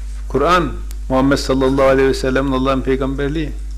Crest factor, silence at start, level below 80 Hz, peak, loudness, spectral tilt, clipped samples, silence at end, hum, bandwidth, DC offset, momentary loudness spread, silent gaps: 10 dB; 0 s; -26 dBFS; -6 dBFS; -16 LUFS; -6 dB/octave; under 0.1%; 0 s; none; 14.5 kHz; under 0.1%; 9 LU; none